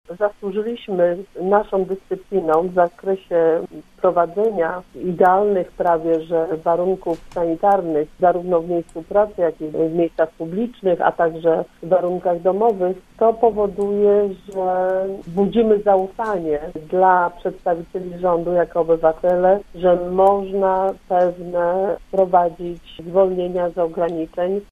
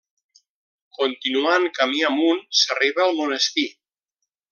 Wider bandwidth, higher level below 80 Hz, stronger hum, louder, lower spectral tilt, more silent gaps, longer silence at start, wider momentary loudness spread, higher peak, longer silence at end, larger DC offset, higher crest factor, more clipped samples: second, 8.8 kHz vs 10.5 kHz; first, -48 dBFS vs -82 dBFS; neither; about the same, -19 LUFS vs -20 LUFS; first, -8.5 dB/octave vs -0.5 dB/octave; neither; second, 0.1 s vs 1 s; about the same, 8 LU vs 6 LU; first, 0 dBFS vs -4 dBFS; second, 0.1 s vs 0.8 s; neither; about the same, 18 dB vs 18 dB; neither